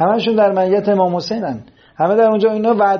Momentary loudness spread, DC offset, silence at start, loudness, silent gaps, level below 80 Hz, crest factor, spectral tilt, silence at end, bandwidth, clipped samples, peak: 9 LU; under 0.1%; 0 s; -15 LUFS; none; -58 dBFS; 12 dB; -5 dB/octave; 0 s; 6.8 kHz; under 0.1%; -2 dBFS